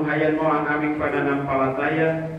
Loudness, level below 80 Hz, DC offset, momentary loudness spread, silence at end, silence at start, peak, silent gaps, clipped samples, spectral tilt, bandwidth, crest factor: -22 LUFS; -52 dBFS; under 0.1%; 2 LU; 0 s; 0 s; -8 dBFS; none; under 0.1%; -8.5 dB/octave; 5.8 kHz; 14 dB